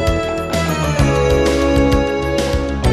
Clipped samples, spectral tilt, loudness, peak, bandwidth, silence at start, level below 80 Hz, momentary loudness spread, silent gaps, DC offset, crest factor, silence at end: under 0.1%; -6 dB/octave; -16 LUFS; 0 dBFS; 14 kHz; 0 s; -22 dBFS; 5 LU; none; under 0.1%; 14 dB; 0 s